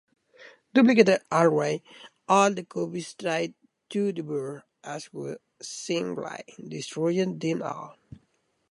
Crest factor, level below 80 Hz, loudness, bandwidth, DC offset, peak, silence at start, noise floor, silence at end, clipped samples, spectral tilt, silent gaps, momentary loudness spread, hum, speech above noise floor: 24 dB; -72 dBFS; -26 LUFS; 11.5 kHz; under 0.1%; -4 dBFS; 0.4 s; -71 dBFS; 0.8 s; under 0.1%; -5 dB/octave; none; 18 LU; none; 45 dB